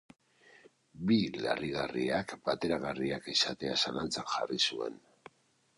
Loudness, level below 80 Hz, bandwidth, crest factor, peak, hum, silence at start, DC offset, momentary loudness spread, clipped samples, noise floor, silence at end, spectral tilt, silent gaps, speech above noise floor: -33 LUFS; -64 dBFS; 11 kHz; 20 dB; -14 dBFS; none; 0.95 s; under 0.1%; 6 LU; under 0.1%; -70 dBFS; 0.85 s; -4 dB/octave; none; 37 dB